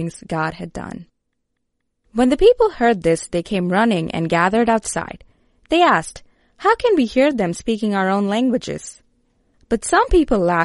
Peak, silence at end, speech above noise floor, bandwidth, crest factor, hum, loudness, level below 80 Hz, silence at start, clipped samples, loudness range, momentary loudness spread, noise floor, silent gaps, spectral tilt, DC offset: -2 dBFS; 0 s; 57 dB; 11.5 kHz; 16 dB; none; -18 LUFS; -36 dBFS; 0 s; under 0.1%; 2 LU; 15 LU; -75 dBFS; none; -5 dB/octave; under 0.1%